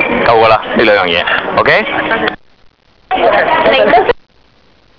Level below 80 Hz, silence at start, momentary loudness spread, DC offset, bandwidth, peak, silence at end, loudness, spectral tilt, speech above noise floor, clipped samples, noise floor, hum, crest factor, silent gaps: -40 dBFS; 0 s; 7 LU; 0.3%; 5.4 kHz; 0 dBFS; 0.8 s; -10 LUFS; -6.5 dB/octave; 39 dB; under 0.1%; -49 dBFS; none; 12 dB; none